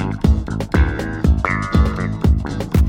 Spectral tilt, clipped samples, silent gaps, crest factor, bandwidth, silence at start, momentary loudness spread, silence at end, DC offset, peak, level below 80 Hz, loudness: -7.5 dB/octave; under 0.1%; none; 16 dB; 16 kHz; 0 s; 3 LU; 0 s; under 0.1%; 0 dBFS; -20 dBFS; -18 LUFS